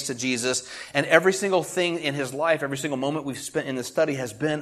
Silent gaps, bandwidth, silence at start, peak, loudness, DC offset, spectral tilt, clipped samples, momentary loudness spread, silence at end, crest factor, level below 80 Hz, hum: none; 13.5 kHz; 0 s; 0 dBFS; -25 LUFS; under 0.1%; -3.5 dB/octave; under 0.1%; 9 LU; 0 s; 24 dB; -66 dBFS; none